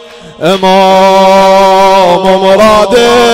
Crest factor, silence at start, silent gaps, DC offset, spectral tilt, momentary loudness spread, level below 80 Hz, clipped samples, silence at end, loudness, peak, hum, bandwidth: 4 dB; 0 s; none; under 0.1%; -4.5 dB/octave; 3 LU; -34 dBFS; 0.4%; 0 s; -5 LUFS; 0 dBFS; none; 16.5 kHz